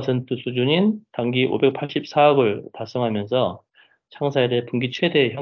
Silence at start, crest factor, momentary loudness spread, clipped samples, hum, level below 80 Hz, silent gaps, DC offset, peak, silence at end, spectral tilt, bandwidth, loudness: 0 s; 18 dB; 10 LU; under 0.1%; none; -62 dBFS; none; under 0.1%; -4 dBFS; 0 s; -7.5 dB/octave; 6.8 kHz; -21 LUFS